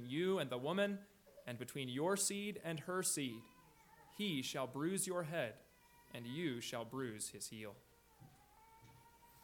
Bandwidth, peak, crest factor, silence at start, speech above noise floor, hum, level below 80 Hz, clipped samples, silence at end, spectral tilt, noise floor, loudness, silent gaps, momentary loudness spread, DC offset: 19 kHz; -26 dBFS; 18 dB; 0 s; 25 dB; none; -78 dBFS; under 0.1%; 0.05 s; -3.5 dB/octave; -67 dBFS; -42 LUFS; none; 15 LU; under 0.1%